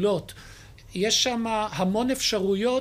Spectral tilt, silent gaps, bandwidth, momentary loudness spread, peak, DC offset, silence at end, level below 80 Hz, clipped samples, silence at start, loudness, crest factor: -3.5 dB/octave; none; 15.5 kHz; 14 LU; -10 dBFS; under 0.1%; 0 s; -52 dBFS; under 0.1%; 0 s; -24 LUFS; 16 dB